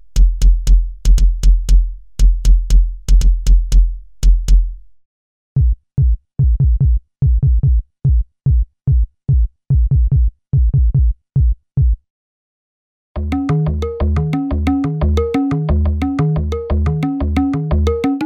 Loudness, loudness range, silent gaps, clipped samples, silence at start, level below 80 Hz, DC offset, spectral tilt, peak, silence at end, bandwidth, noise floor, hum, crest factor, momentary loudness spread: -17 LUFS; 3 LU; 5.05-5.55 s, 12.10-13.15 s; under 0.1%; 0.15 s; -14 dBFS; under 0.1%; -8 dB/octave; -2 dBFS; 0 s; 8.4 kHz; under -90 dBFS; none; 12 dB; 4 LU